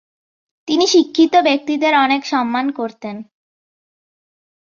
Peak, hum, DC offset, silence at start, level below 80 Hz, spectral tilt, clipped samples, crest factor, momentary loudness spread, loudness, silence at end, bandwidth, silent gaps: -2 dBFS; none; under 0.1%; 0.65 s; -66 dBFS; -2.5 dB/octave; under 0.1%; 16 dB; 17 LU; -15 LUFS; 1.45 s; 7.4 kHz; none